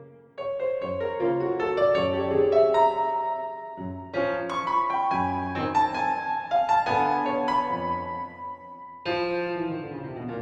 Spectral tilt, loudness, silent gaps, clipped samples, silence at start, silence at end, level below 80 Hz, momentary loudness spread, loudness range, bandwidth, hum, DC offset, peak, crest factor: -6.5 dB/octave; -26 LUFS; none; under 0.1%; 0 s; 0 s; -58 dBFS; 14 LU; 3 LU; 8.8 kHz; none; under 0.1%; -10 dBFS; 16 dB